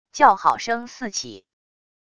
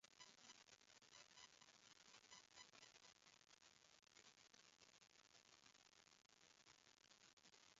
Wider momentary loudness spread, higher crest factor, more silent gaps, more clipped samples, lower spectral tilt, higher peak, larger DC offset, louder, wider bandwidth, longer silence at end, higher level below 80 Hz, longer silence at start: first, 14 LU vs 5 LU; about the same, 22 dB vs 24 dB; second, none vs 7.33-7.37 s; neither; first, -2 dB/octave vs 0.5 dB/octave; first, 0 dBFS vs -46 dBFS; neither; first, -21 LUFS vs -67 LUFS; first, 11 kHz vs 7.6 kHz; first, 0.8 s vs 0 s; first, -62 dBFS vs under -90 dBFS; first, 0.15 s vs 0 s